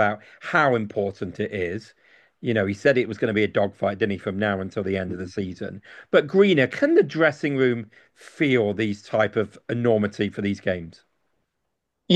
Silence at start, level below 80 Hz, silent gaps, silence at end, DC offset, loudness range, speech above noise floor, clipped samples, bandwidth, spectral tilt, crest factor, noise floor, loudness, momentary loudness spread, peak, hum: 0 s; -62 dBFS; none; 0 s; under 0.1%; 4 LU; 56 dB; under 0.1%; 9 kHz; -7 dB/octave; 20 dB; -79 dBFS; -23 LUFS; 12 LU; -4 dBFS; none